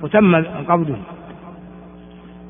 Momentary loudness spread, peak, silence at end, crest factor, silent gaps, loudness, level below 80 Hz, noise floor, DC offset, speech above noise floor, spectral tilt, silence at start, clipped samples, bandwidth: 25 LU; 0 dBFS; 0 s; 20 dB; none; -17 LUFS; -50 dBFS; -39 dBFS; under 0.1%; 23 dB; -6.5 dB/octave; 0 s; under 0.1%; 3.7 kHz